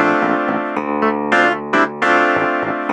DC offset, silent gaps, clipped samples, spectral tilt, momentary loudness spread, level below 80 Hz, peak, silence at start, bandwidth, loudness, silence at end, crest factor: under 0.1%; none; under 0.1%; -5 dB/octave; 6 LU; -56 dBFS; 0 dBFS; 0 s; 9 kHz; -16 LUFS; 0 s; 16 dB